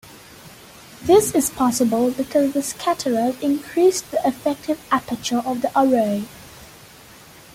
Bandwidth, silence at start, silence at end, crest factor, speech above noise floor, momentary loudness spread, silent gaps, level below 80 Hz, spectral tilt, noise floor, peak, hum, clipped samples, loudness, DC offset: 17 kHz; 0.15 s; 0.9 s; 18 dB; 25 dB; 9 LU; none; -54 dBFS; -4 dB/octave; -45 dBFS; -4 dBFS; none; under 0.1%; -20 LUFS; under 0.1%